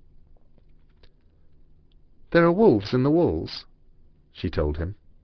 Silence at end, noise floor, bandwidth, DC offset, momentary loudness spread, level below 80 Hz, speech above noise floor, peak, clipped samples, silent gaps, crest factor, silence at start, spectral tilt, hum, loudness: 0.3 s; -54 dBFS; 6.2 kHz; under 0.1%; 16 LU; -42 dBFS; 32 dB; -4 dBFS; under 0.1%; none; 20 dB; 2.3 s; -8.5 dB/octave; none; -23 LUFS